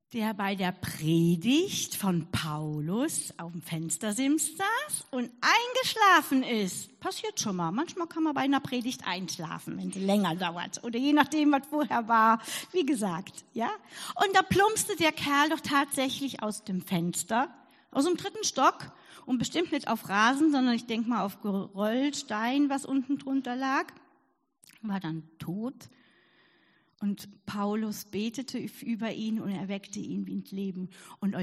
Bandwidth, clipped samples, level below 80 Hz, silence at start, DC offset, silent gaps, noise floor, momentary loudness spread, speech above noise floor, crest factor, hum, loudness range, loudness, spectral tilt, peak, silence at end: 14.5 kHz; under 0.1%; -68 dBFS; 0.1 s; under 0.1%; none; -71 dBFS; 12 LU; 42 dB; 22 dB; none; 9 LU; -29 LUFS; -4 dB/octave; -6 dBFS; 0 s